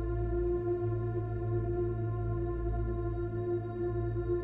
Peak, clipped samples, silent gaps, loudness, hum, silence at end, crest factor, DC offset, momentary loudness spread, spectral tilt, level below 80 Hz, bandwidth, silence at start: -22 dBFS; under 0.1%; none; -34 LUFS; none; 0 s; 10 dB; under 0.1%; 3 LU; -12.5 dB/octave; -40 dBFS; 3.8 kHz; 0 s